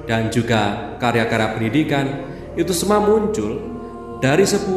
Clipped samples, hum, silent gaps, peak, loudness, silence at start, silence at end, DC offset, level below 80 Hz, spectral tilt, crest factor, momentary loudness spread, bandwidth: under 0.1%; none; none; -2 dBFS; -19 LUFS; 0 s; 0 s; under 0.1%; -42 dBFS; -5 dB/octave; 16 dB; 13 LU; 13.5 kHz